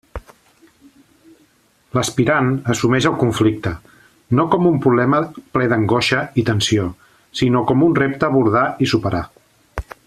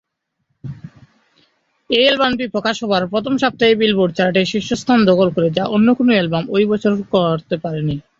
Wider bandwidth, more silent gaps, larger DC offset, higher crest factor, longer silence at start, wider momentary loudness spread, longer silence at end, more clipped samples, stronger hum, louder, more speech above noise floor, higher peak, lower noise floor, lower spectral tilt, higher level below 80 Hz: first, 14 kHz vs 7.8 kHz; neither; neither; about the same, 16 dB vs 16 dB; second, 0.15 s vs 0.65 s; first, 13 LU vs 9 LU; about the same, 0.25 s vs 0.2 s; neither; neither; about the same, -17 LUFS vs -16 LUFS; second, 40 dB vs 55 dB; about the same, -2 dBFS vs 0 dBFS; second, -57 dBFS vs -71 dBFS; about the same, -5.5 dB/octave vs -6 dB/octave; first, -44 dBFS vs -52 dBFS